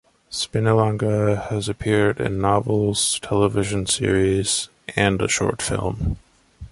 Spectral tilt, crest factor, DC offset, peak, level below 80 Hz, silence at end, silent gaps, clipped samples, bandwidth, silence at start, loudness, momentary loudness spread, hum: -4.5 dB/octave; 18 dB; under 0.1%; -4 dBFS; -38 dBFS; 0.05 s; none; under 0.1%; 11.5 kHz; 0.3 s; -21 LUFS; 7 LU; none